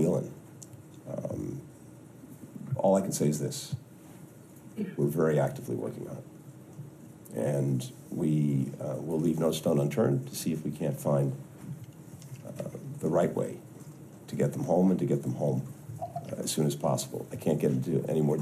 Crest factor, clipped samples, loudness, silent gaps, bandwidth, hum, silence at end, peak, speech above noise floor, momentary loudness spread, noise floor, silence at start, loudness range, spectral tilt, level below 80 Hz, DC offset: 18 dB; under 0.1%; -30 LUFS; none; 15 kHz; none; 0 s; -14 dBFS; 21 dB; 21 LU; -50 dBFS; 0 s; 4 LU; -6.5 dB/octave; -66 dBFS; under 0.1%